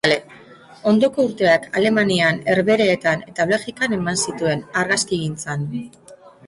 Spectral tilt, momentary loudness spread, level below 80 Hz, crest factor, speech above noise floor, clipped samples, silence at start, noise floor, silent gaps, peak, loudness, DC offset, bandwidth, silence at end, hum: -4.5 dB/octave; 9 LU; -56 dBFS; 16 dB; 25 dB; under 0.1%; 0.05 s; -44 dBFS; none; -4 dBFS; -19 LUFS; under 0.1%; 11.5 kHz; 0.2 s; none